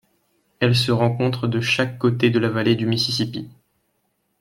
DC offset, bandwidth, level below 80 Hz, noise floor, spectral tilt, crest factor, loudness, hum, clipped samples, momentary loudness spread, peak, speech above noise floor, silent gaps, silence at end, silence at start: under 0.1%; 15 kHz; -56 dBFS; -70 dBFS; -6 dB/octave; 18 dB; -20 LUFS; none; under 0.1%; 6 LU; -2 dBFS; 50 dB; none; 0.9 s; 0.6 s